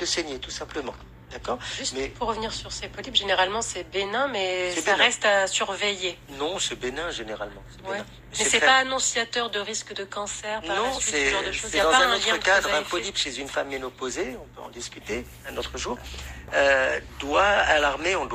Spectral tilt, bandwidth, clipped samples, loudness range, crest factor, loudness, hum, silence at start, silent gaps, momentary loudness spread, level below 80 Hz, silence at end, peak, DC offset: -1.5 dB/octave; 15.5 kHz; under 0.1%; 6 LU; 20 dB; -24 LUFS; none; 0 s; none; 15 LU; -48 dBFS; 0 s; -6 dBFS; under 0.1%